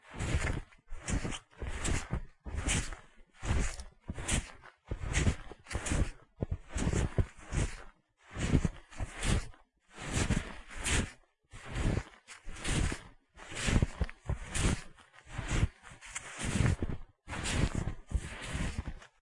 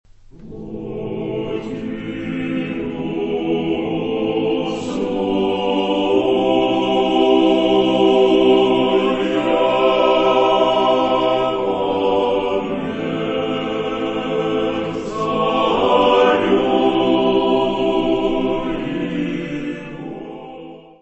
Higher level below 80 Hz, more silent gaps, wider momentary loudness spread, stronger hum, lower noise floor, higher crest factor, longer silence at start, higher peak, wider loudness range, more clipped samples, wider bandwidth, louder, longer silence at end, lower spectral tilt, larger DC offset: about the same, -40 dBFS vs -44 dBFS; neither; about the same, 14 LU vs 12 LU; neither; first, -56 dBFS vs -38 dBFS; first, 24 dB vs 16 dB; second, 0.05 s vs 0.4 s; second, -12 dBFS vs -2 dBFS; second, 2 LU vs 7 LU; neither; first, 11.5 kHz vs 8.2 kHz; second, -36 LUFS vs -18 LUFS; about the same, 0.15 s vs 0.2 s; second, -4.5 dB/octave vs -6.5 dB/octave; neither